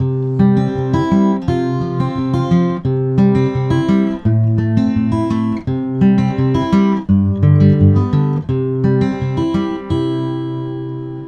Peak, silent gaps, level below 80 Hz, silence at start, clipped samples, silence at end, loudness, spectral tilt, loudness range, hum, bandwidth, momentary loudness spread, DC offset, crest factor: 0 dBFS; none; -38 dBFS; 0 s; under 0.1%; 0 s; -15 LUFS; -9.5 dB/octave; 2 LU; none; 7 kHz; 7 LU; under 0.1%; 14 dB